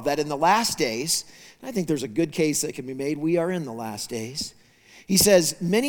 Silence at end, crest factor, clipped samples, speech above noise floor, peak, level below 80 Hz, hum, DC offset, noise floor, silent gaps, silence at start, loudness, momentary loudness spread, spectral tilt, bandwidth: 0 s; 20 dB; under 0.1%; 29 dB; -4 dBFS; -56 dBFS; none; under 0.1%; -53 dBFS; none; 0 s; -23 LUFS; 13 LU; -3.5 dB/octave; 19.5 kHz